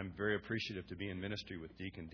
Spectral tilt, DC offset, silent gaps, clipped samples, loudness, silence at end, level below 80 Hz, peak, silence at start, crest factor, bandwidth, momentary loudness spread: -4 dB/octave; under 0.1%; none; under 0.1%; -42 LUFS; 0 s; -64 dBFS; -22 dBFS; 0 s; 20 dB; 5.4 kHz; 10 LU